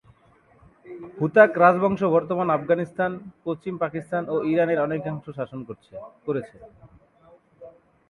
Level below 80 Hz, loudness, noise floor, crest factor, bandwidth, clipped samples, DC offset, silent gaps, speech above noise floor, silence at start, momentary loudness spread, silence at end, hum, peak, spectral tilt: -62 dBFS; -23 LUFS; -58 dBFS; 22 dB; 10.5 kHz; under 0.1%; under 0.1%; none; 35 dB; 0.85 s; 22 LU; 0.4 s; none; -2 dBFS; -8.5 dB/octave